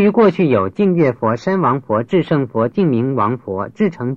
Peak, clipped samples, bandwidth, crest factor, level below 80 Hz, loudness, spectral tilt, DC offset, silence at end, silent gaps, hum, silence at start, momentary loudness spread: -2 dBFS; under 0.1%; 7.2 kHz; 14 dB; -56 dBFS; -16 LUFS; -9 dB/octave; under 0.1%; 0 s; none; none; 0 s; 6 LU